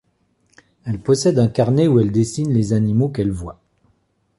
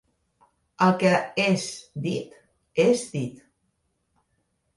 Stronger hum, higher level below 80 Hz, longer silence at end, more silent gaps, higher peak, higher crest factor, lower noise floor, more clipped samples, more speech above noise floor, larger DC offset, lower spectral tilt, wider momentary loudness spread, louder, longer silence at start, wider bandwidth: neither; first, -44 dBFS vs -66 dBFS; second, 0.85 s vs 1.4 s; neither; about the same, -4 dBFS vs -6 dBFS; second, 14 dB vs 20 dB; second, -64 dBFS vs -73 dBFS; neither; about the same, 47 dB vs 50 dB; neither; first, -7.5 dB/octave vs -5.5 dB/octave; about the same, 13 LU vs 12 LU; first, -18 LUFS vs -24 LUFS; about the same, 0.85 s vs 0.8 s; about the same, 11.5 kHz vs 11.5 kHz